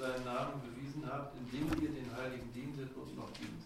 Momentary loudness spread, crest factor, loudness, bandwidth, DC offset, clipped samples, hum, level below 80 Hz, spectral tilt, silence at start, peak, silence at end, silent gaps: 8 LU; 20 dB; -42 LUFS; 16 kHz; under 0.1%; under 0.1%; none; -58 dBFS; -6.5 dB/octave; 0 s; -22 dBFS; 0 s; none